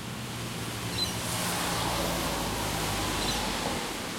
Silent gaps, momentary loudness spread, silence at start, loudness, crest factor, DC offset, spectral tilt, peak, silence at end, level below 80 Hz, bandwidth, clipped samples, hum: none; 6 LU; 0 s; -30 LUFS; 16 dB; under 0.1%; -3 dB/octave; -16 dBFS; 0 s; -44 dBFS; 16.5 kHz; under 0.1%; none